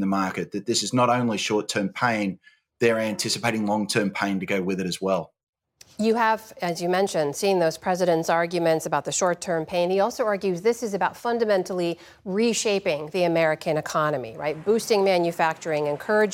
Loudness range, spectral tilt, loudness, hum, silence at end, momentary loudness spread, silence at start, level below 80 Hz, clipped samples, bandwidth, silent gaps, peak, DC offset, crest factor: 2 LU; -4.5 dB/octave; -24 LUFS; none; 0 s; 6 LU; 0 s; -68 dBFS; under 0.1%; 16.5 kHz; 5.43-5.53 s; -6 dBFS; under 0.1%; 18 dB